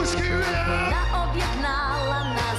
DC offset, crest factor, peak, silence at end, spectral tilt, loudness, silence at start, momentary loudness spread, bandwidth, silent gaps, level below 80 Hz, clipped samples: under 0.1%; 12 dB; -12 dBFS; 0 s; -4.5 dB/octave; -24 LUFS; 0 s; 2 LU; 13.5 kHz; none; -30 dBFS; under 0.1%